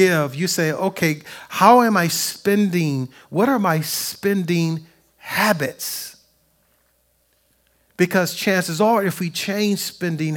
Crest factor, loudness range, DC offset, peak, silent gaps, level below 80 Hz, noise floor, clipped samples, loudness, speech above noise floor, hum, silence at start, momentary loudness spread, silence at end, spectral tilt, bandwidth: 20 dB; 7 LU; under 0.1%; 0 dBFS; none; -66 dBFS; -63 dBFS; under 0.1%; -19 LUFS; 44 dB; none; 0 s; 10 LU; 0 s; -4.5 dB/octave; 18 kHz